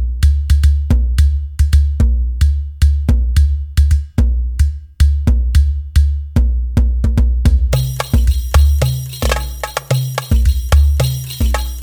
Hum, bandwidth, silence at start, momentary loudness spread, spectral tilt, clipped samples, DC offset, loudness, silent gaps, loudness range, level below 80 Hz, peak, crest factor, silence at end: none; 19.5 kHz; 0 s; 5 LU; -6 dB/octave; under 0.1%; under 0.1%; -15 LUFS; none; 1 LU; -14 dBFS; 0 dBFS; 12 dB; 0 s